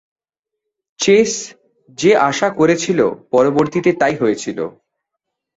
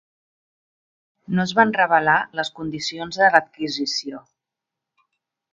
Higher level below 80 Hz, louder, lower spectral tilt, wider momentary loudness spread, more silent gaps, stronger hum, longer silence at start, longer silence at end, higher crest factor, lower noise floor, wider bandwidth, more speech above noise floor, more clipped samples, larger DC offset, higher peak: about the same, -58 dBFS vs -62 dBFS; first, -15 LUFS vs -20 LUFS; about the same, -4.5 dB/octave vs -4 dB/octave; about the same, 12 LU vs 11 LU; neither; neither; second, 1 s vs 1.3 s; second, 0.9 s vs 1.35 s; second, 16 dB vs 22 dB; about the same, -82 dBFS vs -85 dBFS; second, 8 kHz vs 9.2 kHz; about the same, 67 dB vs 65 dB; neither; neither; about the same, -2 dBFS vs 0 dBFS